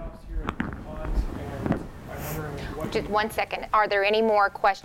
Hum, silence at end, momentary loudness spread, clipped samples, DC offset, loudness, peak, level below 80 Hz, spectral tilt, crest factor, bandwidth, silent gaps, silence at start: none; 0 s; 13 LU; under 0.1%; under 0.1%; -27 LUFS; -8 dBFS; -36 dBFS; -5.5 dB/octave; 18 dB; 16 kHz; none; 0 s